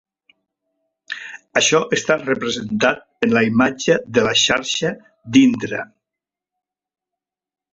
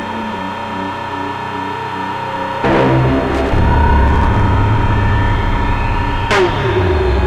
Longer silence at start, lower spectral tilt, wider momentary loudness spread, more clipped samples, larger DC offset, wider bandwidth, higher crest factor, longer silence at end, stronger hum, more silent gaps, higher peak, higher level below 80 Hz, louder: first, 1.1 s vs 0 s; second, -3.5 dB/octave vs -7 dB/octave; first, 16 LU vs 9 LU; neither; neither; second, 8 kHz vs 10.5 kHz; first, 18 dB vs 12 dB; first, 1.9 s vs 0 s; neither; neither; about the same, -2 dBFS vs -2 dBFS; second, -56 dBFS vs -20 dBFS; about the same, -17 LUFS vs -15 LUFS